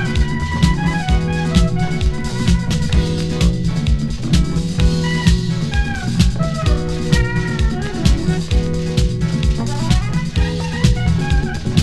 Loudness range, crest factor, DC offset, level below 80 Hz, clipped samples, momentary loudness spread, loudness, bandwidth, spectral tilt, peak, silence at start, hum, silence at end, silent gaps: 1 LU; 16 dB; under 0.1%; -20 dBFS; under 0.1%; 4 LU; -18 LUFS; 12.5 kHz; -6 dB/octave; 0 dBFS; 0 s; none; 0 s; none